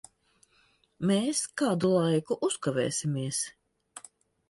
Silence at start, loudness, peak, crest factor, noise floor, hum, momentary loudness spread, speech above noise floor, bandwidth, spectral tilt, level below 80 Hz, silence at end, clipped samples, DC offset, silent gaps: 1 s; -29 LUFS; -14 dBFS; 16 dB; -67 dBFS; none; 21 LU; 39 dB; 12 kHz; -5 dB/octave; -70 dBFS; 0.5 s; under 0.1%; under 0.1%; none